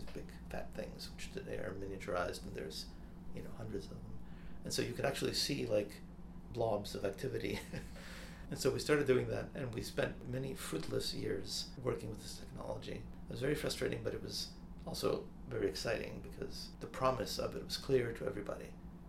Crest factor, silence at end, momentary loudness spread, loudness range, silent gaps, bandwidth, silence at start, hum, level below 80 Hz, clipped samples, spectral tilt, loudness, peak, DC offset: 22 dB; 0 s; 15 LU; 6 LU; none; 16 kHz; 0 s; none; -54 dBFS; under 0.1%; -4.5 dB/octave; -40 LUFS; -18 dBFS; under 0.1%